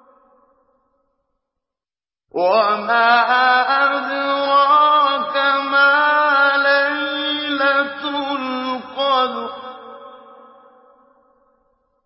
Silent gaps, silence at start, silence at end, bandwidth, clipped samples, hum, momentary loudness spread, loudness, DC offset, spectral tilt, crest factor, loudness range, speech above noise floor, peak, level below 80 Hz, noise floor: none; 2.35 s; 1.9 s; 5.8 kHz; under 0.1%; none; 11 LU; -16 LUFS; under 0.1%; -6.5 dB/octave; 16 dB; 9 LU; over 75 dB; -2 dBFS; -72 dBFS; under -90 dBFS